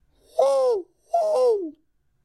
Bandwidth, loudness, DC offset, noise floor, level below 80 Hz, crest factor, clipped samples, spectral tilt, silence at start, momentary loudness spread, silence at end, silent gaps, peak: 12 kHz; -23 LUFS; under 0.1%; -68 dBFS; -70 dBFS; 16 dB; under 0.1%; -3 dB/octave; 0.35 s; 9 LU; 0.55 s; none; -8 dBFS